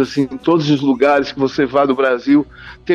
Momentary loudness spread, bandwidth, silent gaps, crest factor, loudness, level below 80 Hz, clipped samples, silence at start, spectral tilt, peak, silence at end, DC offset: 5 LU; 7.2 kHz; none; 12 dB; -15 LUFS; -48 dBFS; under 0.1%; 0 s; -6.5 dB/octave; -4 dBFS; 0 s; under 0.1%